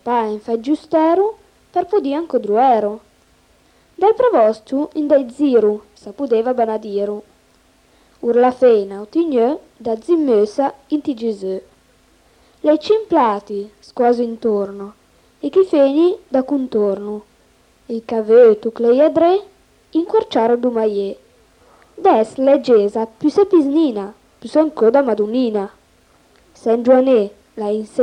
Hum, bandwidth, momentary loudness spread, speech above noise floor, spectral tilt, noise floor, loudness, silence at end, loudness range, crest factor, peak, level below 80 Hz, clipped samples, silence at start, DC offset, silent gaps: none; 9.8 kHz; 13 LU; 39 dB; -7 dB/octave; -54 dBFS; -16 LUFS; 0 s; 4 LU; 16 dB; -2 dBFS; -60 dBFS; under 0.1%; 0.05 s; under 0.1%; none